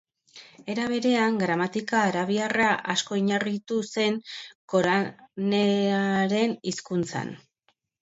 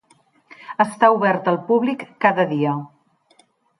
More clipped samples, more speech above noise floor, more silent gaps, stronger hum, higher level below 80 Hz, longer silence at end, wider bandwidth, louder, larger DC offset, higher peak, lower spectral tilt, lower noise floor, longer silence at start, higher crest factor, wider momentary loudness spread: neither; first, 46 dB vs 40 dB; first, 4.55-4.68 s vs none; neither; about the same, -68 dBFS vs -70 dBFS; second, 0.65 s vs 0.95 s; second, 8 kHz vs 11.5 kHz; second, -25 LUFS vs -19 LUFS; neither; second, -10 dBFS vs -2 dBFS; second, -5 dB/octave vs -7 dB/octave; first, -71 dBFS vs -58 dBFS; second, 0.35 s vs 0.7 s; about the same, 16 dB vs 20 dB; about the same, 10 LU vs 9 LU